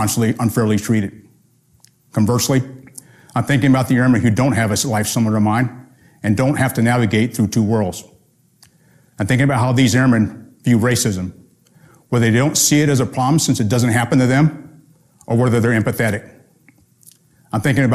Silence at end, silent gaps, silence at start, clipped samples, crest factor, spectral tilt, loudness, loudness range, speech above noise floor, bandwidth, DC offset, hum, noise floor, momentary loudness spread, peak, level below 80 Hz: 0 s; none; 0 s; under 0.1%; 14 dB; -5.5 dB/octave; -16 LUFS; 4 LU; 40 dB; 15 kHz; under 0.1%; none; -55 dBFS; 10 LU; -2 dBFS; -46 dBFS